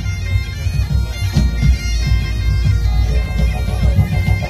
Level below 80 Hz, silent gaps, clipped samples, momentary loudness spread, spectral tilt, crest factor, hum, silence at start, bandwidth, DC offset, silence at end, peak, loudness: -18 dBFS; none; under 0.1%; 4 LU; -6 dB/octave; 14 dB; none; 0 s; 14.5 kHz; under 0.1%; 0 s; 0 dBFS; -17 LUFS